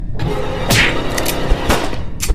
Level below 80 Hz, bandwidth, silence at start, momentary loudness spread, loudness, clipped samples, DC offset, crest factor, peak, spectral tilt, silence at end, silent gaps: -22 dBFS; 16 kHz; 0 s; 9 LU; -17 LUFS; under 0.1%; under 0.1%; 14 dB; 0 dBFS; -4 dB/octave; 0 s; none